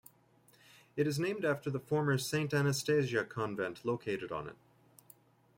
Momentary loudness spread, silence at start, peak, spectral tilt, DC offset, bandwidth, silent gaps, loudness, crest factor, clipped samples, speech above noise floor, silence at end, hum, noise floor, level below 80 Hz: 8 LU; 0.95 s; -18 dBFS; -5.5 dB/octave; under 0.1%; 16.5 kHz; none; -34 LUFS; 18 dB; under 0.1%; 33 dB; 1.05 s; none; -66 dBFS; -70 dBFS